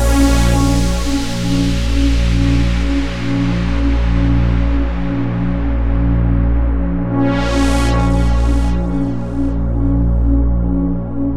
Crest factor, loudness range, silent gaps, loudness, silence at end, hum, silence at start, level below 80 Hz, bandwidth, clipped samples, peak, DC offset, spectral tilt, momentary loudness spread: 12 dB; 1 LU; none; -16 LUFS; 0 s; 60 Hz at -45 dBFS; 0 s; -16 dBFS; 13 kHz; under 0.1%; -2 dBFS; under 0.1%; -6.5 dB/octave; 4 LU